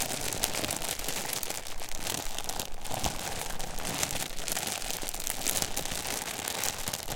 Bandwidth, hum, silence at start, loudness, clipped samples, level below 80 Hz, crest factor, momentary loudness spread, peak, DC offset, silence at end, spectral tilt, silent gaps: 17 kHz; none; 0 s; -32 LUFS; under 0.1%; -42 dBFS; 28 dB; 6 LU; -6 dBFS; under 0.1%; 0 s; -1.5 dB/octave; none